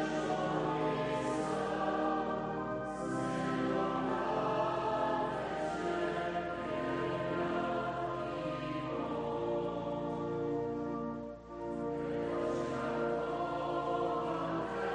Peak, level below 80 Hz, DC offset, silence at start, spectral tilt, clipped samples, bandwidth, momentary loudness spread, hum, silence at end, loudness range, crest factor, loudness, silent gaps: -20 dBFS; -60 dBFS; under 0.1%; 0 s; -6.5 dB/octave; under 0.1%; 10 kHz; 4 LU; none; 0 s; 3 LU; 14 dB; -36 LUFS; none